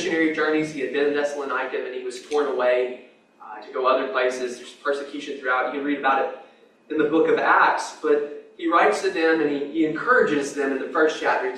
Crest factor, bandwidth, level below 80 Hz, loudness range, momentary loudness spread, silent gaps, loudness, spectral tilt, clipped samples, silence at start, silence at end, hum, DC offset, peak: 18 dB; 11.5 kHz; -72 dBFS; 5 LU; 11 LU; none; -22 LUFS; -4 dB/octave; under 0.1%; 0 s; 0 s; none; under 0.1%; -4 dBFS